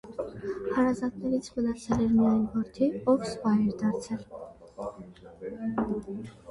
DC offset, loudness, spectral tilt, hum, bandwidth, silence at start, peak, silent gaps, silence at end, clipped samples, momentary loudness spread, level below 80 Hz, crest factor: under 0.1%; -29 LUFS; -7 dB/octave; none; 11 kHz; 0.05 s; -12 dBFS; none; 0 s; under 0.1%; 16 LU; -54 dBFS; 16 dB